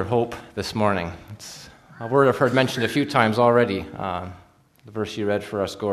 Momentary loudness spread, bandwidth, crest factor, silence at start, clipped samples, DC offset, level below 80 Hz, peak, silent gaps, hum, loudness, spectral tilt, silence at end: 20 LU; 13.5 kHz; 22 dB; 0 s; under 0.1%; under 0.1%; -54 dBFS; -2 dBFS; none; none; -22 LUFS; -6 dB/octave; 0 s